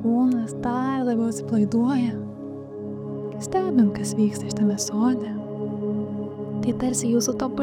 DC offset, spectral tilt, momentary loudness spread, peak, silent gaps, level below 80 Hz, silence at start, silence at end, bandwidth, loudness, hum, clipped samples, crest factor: under 0.1%; -5.5 dB/octave; 11 LU; -8 dBFS; none; -56 dBFS; 0 s; 0 s; 15 kHz; -24 LUFS; none; under 0.1%; 14 dB